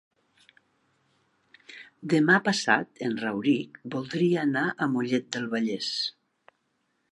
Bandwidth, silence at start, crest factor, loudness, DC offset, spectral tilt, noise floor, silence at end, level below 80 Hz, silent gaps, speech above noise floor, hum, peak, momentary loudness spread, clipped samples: 11.5 kHz; 1.7 s; 22 dB; -26 LUFS; under 0.1%; -5 dB/octave; -74 dBFS; 1 s; -76 dBFS; none; 48 dB; none; -6 dBFS; 13 LU; under 0.1%